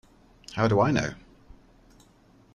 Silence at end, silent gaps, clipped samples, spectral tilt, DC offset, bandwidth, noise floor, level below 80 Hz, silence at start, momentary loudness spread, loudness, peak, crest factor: 1.4 s; none; under 0.1%; -6.5 dB/octave; under 0.1%; 10.5 kHz; -58 dBFS; -52 dBFS; 0.5 s; 17 LU; -25 LUFS; -10 dBFS; 20 dB